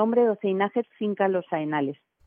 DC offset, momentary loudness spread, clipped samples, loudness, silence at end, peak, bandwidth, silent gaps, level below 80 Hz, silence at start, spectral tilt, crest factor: under 0.1%; 7 LU; under 0.1%; -26 LUFS; 0.3 s; -10 dBFS; 4.4 kHz; none; -84 dBFS; 0 s; -10 dB/octave; 16 dB